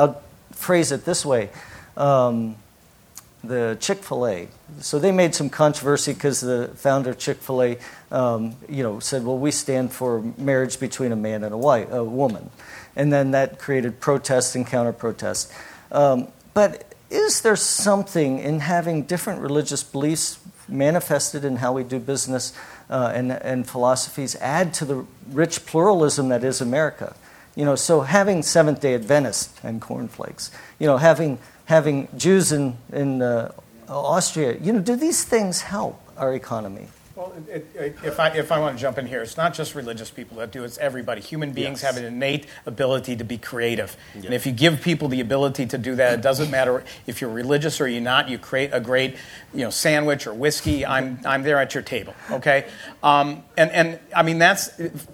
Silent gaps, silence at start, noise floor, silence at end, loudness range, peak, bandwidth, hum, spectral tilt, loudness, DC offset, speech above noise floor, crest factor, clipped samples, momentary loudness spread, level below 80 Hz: none; 0 s; -53 dBFS; 0 s; 5 LU; 0 dBFS; 18 kHz; none; -4.5 dB/octave; -22 LUFS; under 0.1%; 31 dB; 22 dB; under 0.1%; 14 LU; -56 dBFS